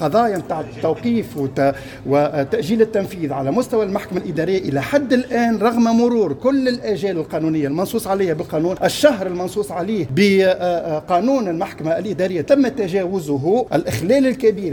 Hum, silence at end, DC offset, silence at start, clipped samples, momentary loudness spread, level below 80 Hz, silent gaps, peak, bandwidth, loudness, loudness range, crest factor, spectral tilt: none; 0 s; under 0.1%; 0 s; under 0.1%; 7 LU; -50 dBFS; none; 0 dBFS; 19 kHz; -18 LUFS; 2 LU; 18 dB; -6 dB/octave